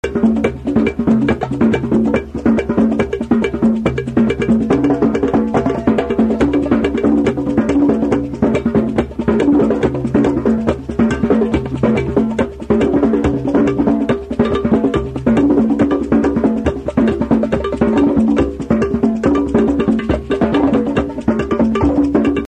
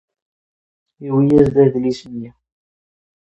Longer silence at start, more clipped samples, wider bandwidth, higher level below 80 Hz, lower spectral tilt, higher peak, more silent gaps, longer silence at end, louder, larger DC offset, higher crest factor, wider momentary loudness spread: second, 0.05 s vs 1 s; neither; about the same, 8.8 kHz vs 8 kHz; first, -32 dBFS vs -46 dBFS; about the same, -8 dB/octave vs -9 dB/octave; about the same, 0 dBFS vs 0 dBFS; neither; second, 0.05 s vs 0.95 s; about the same, -15 LUFS vs -15 LUFS; first, 0.2% vs under 0.1%; about the same, 14 dB vs 18 dB; second, 4 LU vs 19 LU